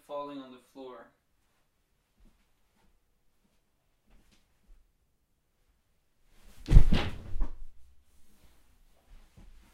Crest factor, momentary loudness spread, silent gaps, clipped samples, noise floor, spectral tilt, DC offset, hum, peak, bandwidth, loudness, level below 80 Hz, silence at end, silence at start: 28 dB; 25 LU; none; under 0.1%; -74 dBFS; -7 dB/octave; under 0.1%; none; -2 dBFS; 6.4 kHz; -30 LUFS; -32 dBFS; 1.9 s; 0.1 s